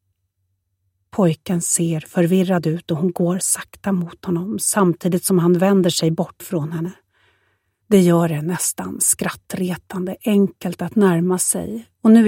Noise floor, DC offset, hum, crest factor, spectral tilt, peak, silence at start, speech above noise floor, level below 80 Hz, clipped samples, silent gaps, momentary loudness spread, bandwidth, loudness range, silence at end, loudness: -71 dBFS; under 0.1%; none; 16 dB; -5 dB/octave; -2 dBFS; 1.15 s; 53 dB; -60 dBFS; under 0.1%; none; 10 LU; 17 kHz; 2 LU; 0 s; -19 LUFS